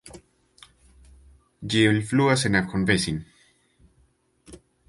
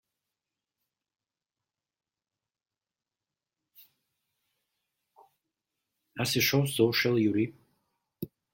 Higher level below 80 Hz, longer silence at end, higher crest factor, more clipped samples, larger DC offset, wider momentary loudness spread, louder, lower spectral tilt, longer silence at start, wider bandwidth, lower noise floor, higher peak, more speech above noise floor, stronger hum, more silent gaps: first, -50 dBFS vs -72 dBFS; about the same, 0.35 s vs 0.3 s; about the same, 22 dB vs 24 dB; neither; neither; second, 10 LU vs 19 LU; first, -22 LUFS vs -27 LUFS; about the same, -5 dB/octave vs -4.5 dB/octave; second, 0.05 s vs 6.15 s; second, 11.5 kHz vs 16.5 kHz; second, -64 dBFS vs under -90 dBFS; first, -4 dBFS vs -10 dBFS; second, 42 dB vs over 64 dB; neither; neither